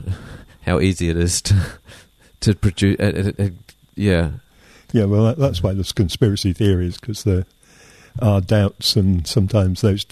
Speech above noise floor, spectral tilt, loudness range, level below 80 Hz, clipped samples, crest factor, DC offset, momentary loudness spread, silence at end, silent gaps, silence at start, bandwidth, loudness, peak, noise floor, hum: 30 dB; -6 dB/octave; 1 LU; -36 dBFS; under 0.1%; 16 dB; under 0.1%; 10 LU; 0.1 s; none; 0 s; 13.5 kHz; -19 LUFS; -2 dBFS; -48 dBFS; none